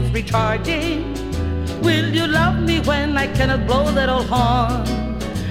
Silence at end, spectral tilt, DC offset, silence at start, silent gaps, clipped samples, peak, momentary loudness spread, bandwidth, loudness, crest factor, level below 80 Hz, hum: 0 s; -6 dB/octave; under 0.1%; 0 s; none; under 0.1%; -2 dBFS; 7 LU; 16 kHz; -19 LUFS; 16 dB; -28 dBFS; none